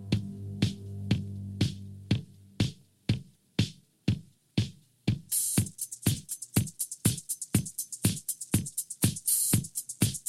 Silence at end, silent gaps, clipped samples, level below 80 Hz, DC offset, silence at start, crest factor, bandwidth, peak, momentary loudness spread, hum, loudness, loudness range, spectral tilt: 0.1 s; none; under 0.1%; -54 dBFS; under 0.1%; 0 s; 22 dB; 16.5 kHz; -10 dBFS; 9 LU; none; -31 LUFS; 5 LU; -4 dB/octave